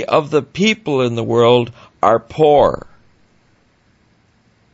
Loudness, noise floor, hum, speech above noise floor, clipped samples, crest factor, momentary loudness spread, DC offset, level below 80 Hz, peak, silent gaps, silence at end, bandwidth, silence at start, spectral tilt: -15 LUFS; -56 dBFS; none; 42 dB; under 0.1%; 16 dB; 7 LU; under 0.1%; -46 dBFS; 0 dBFS; none; 1.95 s; 8 kHz; 0 s; -6 dB/octave